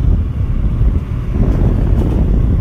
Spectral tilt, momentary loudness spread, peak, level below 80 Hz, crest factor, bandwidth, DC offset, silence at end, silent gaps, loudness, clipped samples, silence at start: -10 dB/octave; 4 LU; 0 dBFS; -14 dBFS; 12 dB; 3.8 kHz; under 0.1%; 0 s; none; -16 LUFS; under 0.1%; 0 s